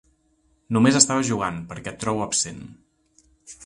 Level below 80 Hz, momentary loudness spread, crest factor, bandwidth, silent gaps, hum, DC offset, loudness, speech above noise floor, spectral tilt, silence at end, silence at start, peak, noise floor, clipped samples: -54 dBFS; 17 LU; 24 dB; 11.5 kHz; none; none; under 0.1%; -21 LUFS; 43 dB; -3.5 dB/octave; 0 s; 0.7 s; 0 dBFS; -65 dBFS; under 0.1%